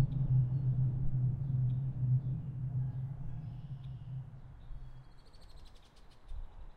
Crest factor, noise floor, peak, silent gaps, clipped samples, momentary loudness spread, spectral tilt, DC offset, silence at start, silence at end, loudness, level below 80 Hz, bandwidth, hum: 16 dB; -56 dBFS; -18 dBFS; none; under 0.1%; 21 LU; -10.5 dB/octave; under 0.1%; 0 s; 0.05 s; -36 LUFS; -48 dBFS; 4.5 kHz; none